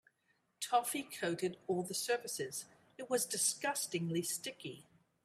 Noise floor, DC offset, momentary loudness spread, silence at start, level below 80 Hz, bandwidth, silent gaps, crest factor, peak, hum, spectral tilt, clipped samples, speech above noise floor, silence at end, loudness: -78 dBFS; under 0.1%; 14 LU; 0.6 s; -84 dBFS; 16 kHz; none; 20 dB; -18 dBFS; none; -3 dB/octave; under 0.1%; 40 dB; 0.4 s; -37 LUFS